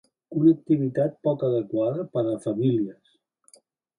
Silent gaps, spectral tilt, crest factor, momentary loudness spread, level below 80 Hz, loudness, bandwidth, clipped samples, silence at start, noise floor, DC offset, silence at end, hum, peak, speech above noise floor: none; -9.5 dB/octave; 18 dB; 7 LU; -70 dBFS; -25 LUFS; 11 kHz; under 0.1%; 0.3 s; -59 dBFS; under 0.1%; 1.05 s; none; -8 dBFS; 35 dB